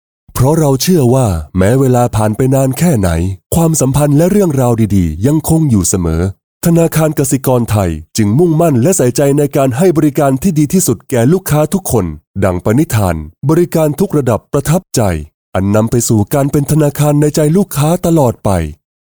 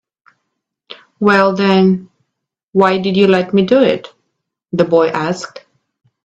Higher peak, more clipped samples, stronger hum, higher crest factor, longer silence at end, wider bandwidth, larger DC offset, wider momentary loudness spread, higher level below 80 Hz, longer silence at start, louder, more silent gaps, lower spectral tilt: about the same, -2 dBFS vs 0 dBFS; neither; neither; second, 10 dB vs 16 dB; second, 0.35 s vs 0.65 s; first, over 20 kHz vs 8 kHz; first, 0.4% vs under 0.1%; second, 5 LU vs 10 LU; first, -32 dBFS vs -56 dBFS; second, 0.35 s vs 0.9 s; about the same, -12 LUFS vs -13 LUFS; first, 3.46-3.50 s, 6.44-6.61 s, 12.27-12.34 s, 15.34-15.53 s vs 2.63-2.68 s; about the same, -6.5 dB/octave vs -6.5 dB/octave